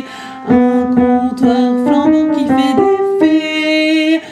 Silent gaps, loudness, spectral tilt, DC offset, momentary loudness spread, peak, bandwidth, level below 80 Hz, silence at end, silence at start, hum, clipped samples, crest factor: none; -12 LUFS; -5.5 dB/octave; under 0.1%; 2 LU; 0 dBFS; 10.5 kHz; -46 dBFS; 0 s; 0 s; none; under 0.1%; 12 dB